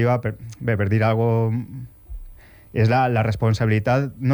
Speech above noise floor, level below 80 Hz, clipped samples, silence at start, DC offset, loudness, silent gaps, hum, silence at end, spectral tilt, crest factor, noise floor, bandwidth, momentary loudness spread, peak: 24 dB; -44 dBFS; under 0.1%; 0 s; under 0.1%; -21 LUFS; none; none; 0 s; -8 dB/octave; 12 dB; -44 dBFS; 19.5 kHz; 19 LU; -8 dBFS